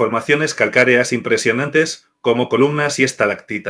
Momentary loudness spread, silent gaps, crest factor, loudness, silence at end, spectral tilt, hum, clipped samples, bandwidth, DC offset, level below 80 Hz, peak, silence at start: 6 LU; none; 16 dB; -16 LUFS; 0 s; -4 dB/octave; none; under 0.1%; 11 kHz; under 0.1%; -66 dBFS; 0 dBFS; 0 s